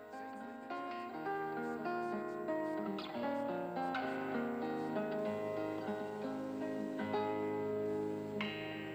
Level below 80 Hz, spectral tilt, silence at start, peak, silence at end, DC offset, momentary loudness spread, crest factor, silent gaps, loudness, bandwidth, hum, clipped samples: -78 dBFS; -6.5 dB/octave; 0 s; -24 dBFS; 0 s; under 0.1%; 5 LU; 16 dB; none; -40 LUFS; 16 kHz; none; under 0.1%